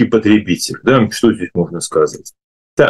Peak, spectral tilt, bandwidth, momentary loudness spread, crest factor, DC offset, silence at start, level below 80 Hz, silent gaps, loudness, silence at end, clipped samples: -2 dBFS; -5 dB/octave; 12.5 kHz; 8 LU; 12 dB; under 0.1%; 0 s; -48 dBFS; 2.44-2.77 s; -14 LUFS; 0 s; under 0.1%